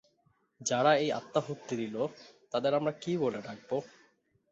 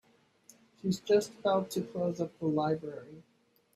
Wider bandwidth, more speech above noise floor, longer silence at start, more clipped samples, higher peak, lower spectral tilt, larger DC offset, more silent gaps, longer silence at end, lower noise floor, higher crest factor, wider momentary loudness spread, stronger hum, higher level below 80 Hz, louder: second, 8.2 kHz vs 14.5 kHz; first, 41 dB vs 31 dB; second, 0.6 s vs 0.85 s; neither; first, -12 dBFS vs -16 dBFS; second, -4.5 dB/octave vs -6 dB/octave; neither; neither; about the same, 0.65 s vs 0.55 s; first, -72 dBFS vs -63 dBFS; about the same, 20 dB vs 18 dB; about the same, 11 LU vs 13 LU; neither; about the same, -76 dBFS vs -72 dBFS; about the same, -32 LUFS vs -32 LUFS